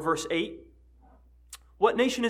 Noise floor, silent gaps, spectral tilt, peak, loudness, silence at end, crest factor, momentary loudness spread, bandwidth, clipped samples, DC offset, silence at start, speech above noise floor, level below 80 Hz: -57 dBFS; none; -3.5 dB/octave; -8 dBFS; -27 LUFS; 0 s; 22 dB; 24 LU; 16 kHz; under 0.1%; under 0.1%; 0 s; 30 dB; -58 dBFS